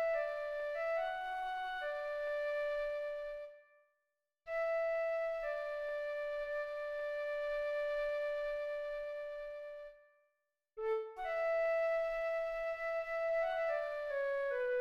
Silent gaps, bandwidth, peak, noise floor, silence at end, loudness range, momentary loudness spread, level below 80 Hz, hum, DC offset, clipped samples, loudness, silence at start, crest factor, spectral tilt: none; 12 kHz; -26 dBFS; -87 dBFS; 0 s; 5 LU; 9 LU; -66 dBFS; none; under 0.1%; under 0.1%; -38 LUFS; 0 s; 12 dB; -2 dB/octave